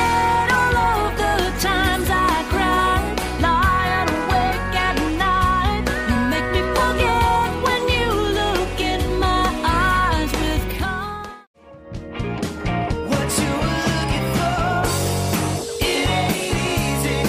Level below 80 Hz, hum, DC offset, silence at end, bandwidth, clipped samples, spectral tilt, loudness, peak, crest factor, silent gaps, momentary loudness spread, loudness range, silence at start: -28 dBFS; none; under 0.1%; 0 s; 16 kHz; under 0.1%; -4.5 dB/octave; -20 LUFS; -4 dBFS; 16 dB; 11.47-11.54 s; 7 LU; 4 LU; 0 s